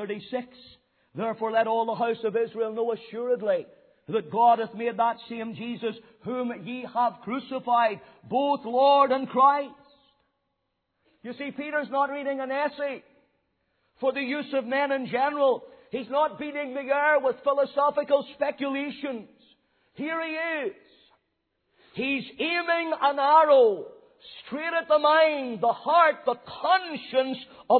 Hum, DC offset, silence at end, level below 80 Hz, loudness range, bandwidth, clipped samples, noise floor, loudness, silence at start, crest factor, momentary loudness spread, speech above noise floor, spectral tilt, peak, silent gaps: none; under 0.1%; 0 s; -76 dBFS; 9 LU; 4.5 kHz; under 0.1%; -78 dBFS; -26 LUFS; 0 s; 20 dB; 15 LU; 53 dB; -8 dB/octave; -6 dBFS; none